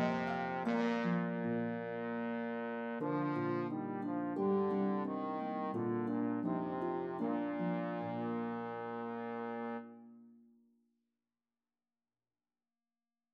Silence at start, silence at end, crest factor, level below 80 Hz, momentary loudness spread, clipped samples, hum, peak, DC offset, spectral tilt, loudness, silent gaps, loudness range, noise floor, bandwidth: 0 s; 2.95 s; 18 dB; -84 dBFS; 7 LU; under 0.1%; none; -20 dBFS; under 0.1%; -8.5 dB/octave; -38 LUFS; none; 9 LU; under -90 dBFS; 7 kHz